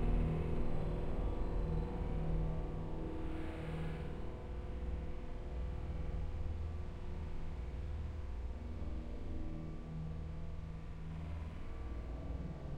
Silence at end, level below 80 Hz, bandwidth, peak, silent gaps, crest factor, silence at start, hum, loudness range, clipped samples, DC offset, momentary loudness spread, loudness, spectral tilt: 0 s; -42 dBFS; 7 kHz; -24 dBFS; none; 16 dB; 0 s; none; 5 LU; under 0.1%; under 0.1%; 7 LU; -44 LUFS; -8.5 dB/octave